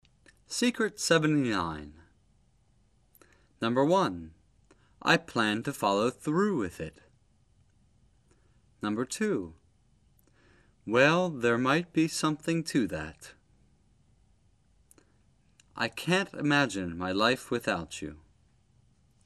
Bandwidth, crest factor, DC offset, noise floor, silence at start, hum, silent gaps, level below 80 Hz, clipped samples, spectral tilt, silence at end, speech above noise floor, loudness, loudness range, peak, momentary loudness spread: 13 kHz; 24 dB; under 0.1%; -67 dBFS; 0.5 s; none; none; -62 dBFS; under 0.1%; -4.5 dB/octave; 1.1 s; 39 dB; -28 LUFS; 9 LU; -8 dBFS; 17 LU